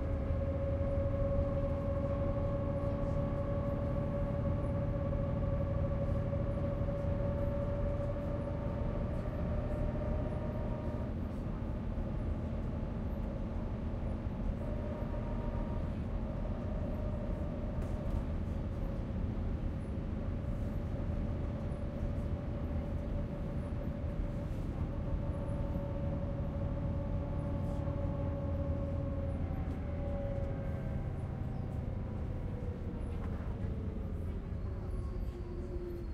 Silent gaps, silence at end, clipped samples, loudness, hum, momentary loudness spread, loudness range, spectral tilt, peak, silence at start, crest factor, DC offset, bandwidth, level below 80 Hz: none; 0 s; under 0.1%; -38 LUFS; none; 5 LU; 4 LU; -10 dB/octave; -22 dBFS; 0 s; 14 dB; under 0.1%; 6.4 kHz; -40 dBFS